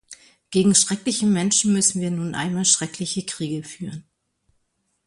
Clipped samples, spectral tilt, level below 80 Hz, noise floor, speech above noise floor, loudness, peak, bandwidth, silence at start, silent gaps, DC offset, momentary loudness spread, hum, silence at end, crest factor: under 0.1%; -3.5 dB/octave; -60 dBFS; -71 dBFS; 50 dB; -20 LUFS; -4 dBFS; 11.5 kHz; 0.1 s; none; under 0.1%; 15 LU; none; 1.05 s; 20 dB